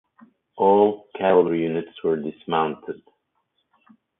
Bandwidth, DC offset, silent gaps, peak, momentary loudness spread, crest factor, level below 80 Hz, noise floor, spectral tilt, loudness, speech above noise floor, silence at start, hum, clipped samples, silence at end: 3.9 kHz; under 0.1%; none; -4 dBFS; 13 LU; 20 dB; -64 dBFS; -73 dBFS; -11 dB/octave; -21 LUFS; 52 dB; 0.55 s; none; under 0.1%; 1.25 s